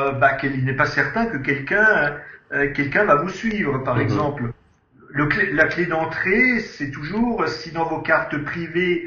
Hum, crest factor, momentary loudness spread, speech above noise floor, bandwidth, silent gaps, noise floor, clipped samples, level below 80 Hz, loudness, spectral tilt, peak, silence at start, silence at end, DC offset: none; 20 dB; 9 LU; 30 dB; 7.4 kHz; none; -51 dBFS; under 0.1%; -46 dBFS; -20 LUFS; -7 dB/octave; -2 dBFS; 0 s; 0 s; under 0.1%